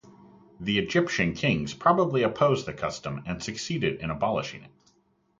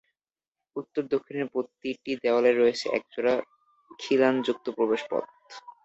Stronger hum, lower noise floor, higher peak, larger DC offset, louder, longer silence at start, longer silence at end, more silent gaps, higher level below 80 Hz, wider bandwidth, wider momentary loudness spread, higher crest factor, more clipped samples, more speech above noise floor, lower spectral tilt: neither; second, -67 dBFS vs under -90 dBFS; about the same, -6 dBFS vs -8 dBFS; neither; about the same, -27 LUFS vs -27 LUFS; second, 0.05 s vs 0.75 s; first, 0.7 s vs 0.15 s; neither; first, -54 dBFS vs -72 dBFS; first, 9.2 kHz vs 8 kHz; second, 10 LU vs 17 LU; about the same, 20 dB vs 20 dB; neither; second, 41 dB vs over 64 dB; about the same, -5.5 dB/octave vs -5 dB/octave